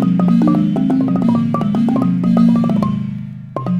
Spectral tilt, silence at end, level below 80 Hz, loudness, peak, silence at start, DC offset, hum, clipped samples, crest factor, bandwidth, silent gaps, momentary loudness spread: -9.5 dB/octave; 0 s; -48 dBFS; -15 LUFS; -2 dBFS; 0 s; under 0.1%; none; under 0.1%; 12 dB; 6.6 kHz; none; 11 LU